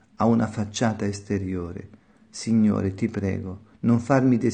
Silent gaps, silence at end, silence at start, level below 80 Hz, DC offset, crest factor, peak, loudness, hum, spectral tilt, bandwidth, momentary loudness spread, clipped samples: none; 0 s; 0.2 s; -56 dBFS; under 0.1%; 18 dB; -6 dBFS; -24 LUFS; none; -7 dB/octave; 9.4 kHz; 14 LU; under 0.1%